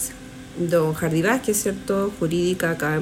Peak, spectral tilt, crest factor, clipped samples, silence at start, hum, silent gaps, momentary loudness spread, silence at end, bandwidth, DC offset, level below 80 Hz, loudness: -8 dBFS; -5 dB/octave; 16 dB; under 0.1%; 0 s; none; none; 9 LU; 0 s; 16.5 kHz; under 0.1%; -48 dBFS; -22 LUFS